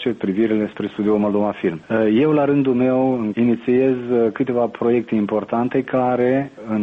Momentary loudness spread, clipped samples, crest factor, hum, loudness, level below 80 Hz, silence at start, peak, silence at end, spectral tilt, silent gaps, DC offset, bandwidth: 5 LU; under 0.1%; 12 dB; none; -19 LUFS; -58 dBFS; 0 s; -6 dBFS; 0 s; -9.5 dB/octave; none; under 0.1%; 4.6 kHz